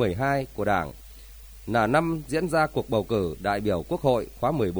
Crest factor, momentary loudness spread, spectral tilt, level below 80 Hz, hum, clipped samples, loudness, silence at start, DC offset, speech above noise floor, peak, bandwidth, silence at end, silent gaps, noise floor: 18 dB; 17 LU; -6.5 dB/octave; -46 dBFS; none; under 0.1%; -26 LUFS; 0 s; under 0.1%; 20 dB; -8 dBFS; over 20 kHz; 0 s; none; -45 dBFS